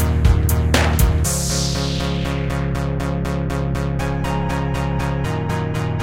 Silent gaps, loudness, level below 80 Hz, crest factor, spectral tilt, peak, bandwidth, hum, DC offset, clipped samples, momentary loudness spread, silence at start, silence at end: none; -20 LUFS; -24 dBFS; 18 dB; -5 dB/octave; 0 dBFS; 17 kHz; none; 1%; under 0.1%; 6 LU; 0 s; 0 s